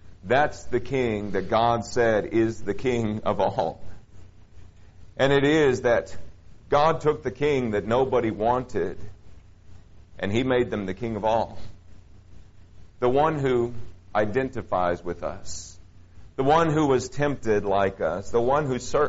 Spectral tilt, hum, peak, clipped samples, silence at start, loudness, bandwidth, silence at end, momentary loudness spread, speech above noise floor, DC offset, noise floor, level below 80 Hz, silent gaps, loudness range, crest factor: -5 dB/octave; none; -6 dBFS; under 0.1%; 0.05 s; -24 LUFS; 8 kHz; 0 s; 12 LU; 23 dB; under 0.1%; -46 dBFS; -48 dBFS; none; 5 LU; 18 dB